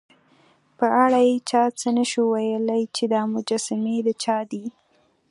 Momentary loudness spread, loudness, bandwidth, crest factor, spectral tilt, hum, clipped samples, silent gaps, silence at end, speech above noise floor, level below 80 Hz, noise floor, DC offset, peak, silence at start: 7 LU; -22 LUFS; 11.5 kHz; 18 dB; -4 dB/octave; none; under 0.1%; none; 0.6 s; 42 dB; -76 dBFS; -63 dBFS; under 0.1%; -4 dBFS; 0.8 s